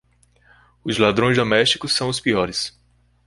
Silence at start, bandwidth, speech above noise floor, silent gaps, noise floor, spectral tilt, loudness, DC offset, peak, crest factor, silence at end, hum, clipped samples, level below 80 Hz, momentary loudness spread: 0.85 s; 11.5 kHz; 37 dB; none; -56 dBFS; -4 dB/octave; -19 LUFS; under 0.1%; -2 dBFS; 20 dB; 0.55 s; 60 Hz at -45 dBFS; under 0.1%; -50 dBFS; 10 LU